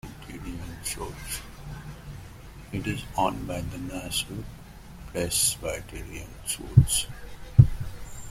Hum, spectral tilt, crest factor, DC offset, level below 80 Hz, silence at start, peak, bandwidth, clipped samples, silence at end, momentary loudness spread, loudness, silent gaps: none; -4.5 dB/octave; 26 dB; under 0.1%; -40 dBFS; 0.05 s; -2 dBFS; 16.5 kHz; under 0.1%; 0 s; 23 LU; -27 LUFS; none